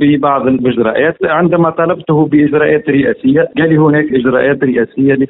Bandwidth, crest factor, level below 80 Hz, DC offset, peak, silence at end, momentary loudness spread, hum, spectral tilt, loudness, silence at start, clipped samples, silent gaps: 4 kHz; 10 dB; -46 dBFS; under 0.1%; 0 dBFS; 0 s; 3 LU; none; -11.5 dB/octave; -11 LUFS; 0 s; under 0.1%; none